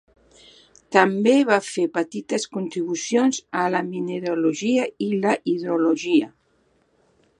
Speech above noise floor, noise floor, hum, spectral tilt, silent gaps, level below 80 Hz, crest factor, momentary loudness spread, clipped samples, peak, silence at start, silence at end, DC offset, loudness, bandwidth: 43 dB; -64 dBFS; none; -4.5 dB/octave; none; -70 dBFS; 22 dB; 9 LU; under 0.1%; 0 dBFS; 0.9 s; 1.1 s; under 0.1%; -22 LUFS; 11.5 kHz